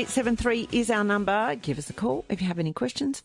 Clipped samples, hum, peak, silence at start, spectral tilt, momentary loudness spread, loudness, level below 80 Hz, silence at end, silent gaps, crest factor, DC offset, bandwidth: under 0.1%; none; -10 dBFS; 0 s; -5 dB/octave; 5 LU; -27 LUFS; -48 dBFS; 0.05 s; none; 16 dB; under 0.1%; 11.5 kHz